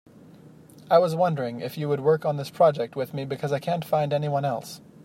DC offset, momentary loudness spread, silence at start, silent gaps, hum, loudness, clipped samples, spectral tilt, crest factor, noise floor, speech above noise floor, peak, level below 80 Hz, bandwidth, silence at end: under 0.1%; 10 LU; 0.45 s; none; none; -25 LUFS; under 0.1%; -7 dB/octave; 20 dB; -49 dBFS; 25 dB; -6 dBFS; -70 dBFS; 16 kHz; 0.25 s